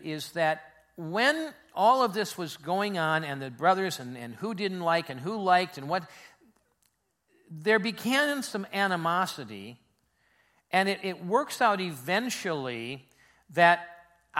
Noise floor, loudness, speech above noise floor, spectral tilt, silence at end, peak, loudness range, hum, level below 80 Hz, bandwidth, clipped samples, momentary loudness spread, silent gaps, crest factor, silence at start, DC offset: -74 dBFS; -28 LUFS; 45 dB; -4 dB/octave; 0 s; -6 dBFS; 3 LU; none; -76 dBFS; 16.5 kHz; under 0.1%; 13 LU; none; 24 dB; 0 s; under 0.1%